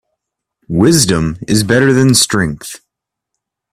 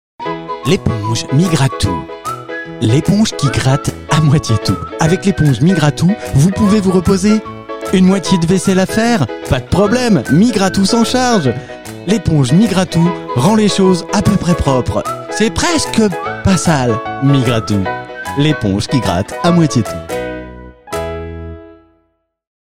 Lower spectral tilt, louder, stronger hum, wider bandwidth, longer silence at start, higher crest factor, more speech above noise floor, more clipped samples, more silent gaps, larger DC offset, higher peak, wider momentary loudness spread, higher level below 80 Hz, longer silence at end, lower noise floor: about the same, -4.5 dB/octave vs -5.5 dB/octave; about the same, -11 LUFS vs -13 LUFS; neither; about the same, 16 kHz vs 16 kHz; first, 0.7 s vs 0.2 s; about the same, 14 dB vs 14 dB; first, 65 dB vs 50 dB; neither; neither; second, under 0.1% vs 1%; about the same, 0 dBFS vs 0 dBFS; about the same, 11 LU vs 12 LU; second, -40 dBFS vs -34 dBFS; about the same, 0.95 s vs 0.85 s; first, -77 dBFS vs -62 dBFS